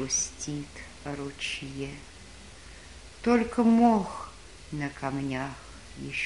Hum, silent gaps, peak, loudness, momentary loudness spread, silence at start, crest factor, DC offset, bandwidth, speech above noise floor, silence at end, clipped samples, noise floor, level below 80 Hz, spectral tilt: none; none; -10 dBFS; -29 LUFS; 24 LU; 0 s; 20 dB; 0.2%; 11.5 kHz; 20 dB; 0 s; under 0.1%; -48 dBFS; -52 dBFS; -4 dB/octave